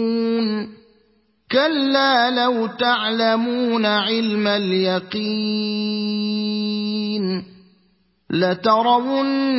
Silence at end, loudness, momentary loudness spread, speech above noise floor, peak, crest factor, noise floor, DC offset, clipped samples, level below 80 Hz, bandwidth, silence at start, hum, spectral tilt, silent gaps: 0 s; -19 LUFS; 7 LU; 43 dB; -4 dBFS; 16 dB; -62 dBFS; under 0.1%; under 0.1%; -66 dBFS; 5.8 kHz; 0 s; none; -8.5 dB/octave; none